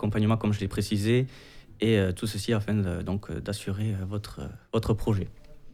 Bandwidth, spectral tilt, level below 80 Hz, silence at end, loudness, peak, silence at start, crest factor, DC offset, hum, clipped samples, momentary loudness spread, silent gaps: 15 kHz; -6.5 dB/octave; -46 dBFS; 0 s; -28 LUFS; -12 dBFS; 0 s; 16 dB; under 0.1%; none; under 0.1%; 10 LU; none